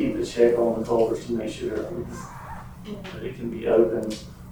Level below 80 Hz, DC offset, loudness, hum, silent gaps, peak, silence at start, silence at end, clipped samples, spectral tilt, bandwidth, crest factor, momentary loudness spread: -46 dBFS; under 0.1%; -25 LUFS; none; none; -6 dBFS; 0 s; 0 s; under 0.1%; -6.5 dB/octave; over 20 kHz; 20 dB; 17 LU